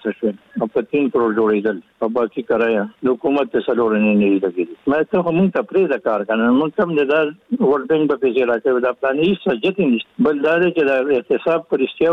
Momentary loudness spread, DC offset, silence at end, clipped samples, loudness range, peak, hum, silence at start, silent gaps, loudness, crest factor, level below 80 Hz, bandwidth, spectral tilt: 6 LU; under 0.1%; 0 s; under 0.1%; 1 LU; -6 dBFS; none; 0.05 s; none; -18 LUFS; 12 dB; -58 dBFS; 5.2 kHz; -8.5 dB/octave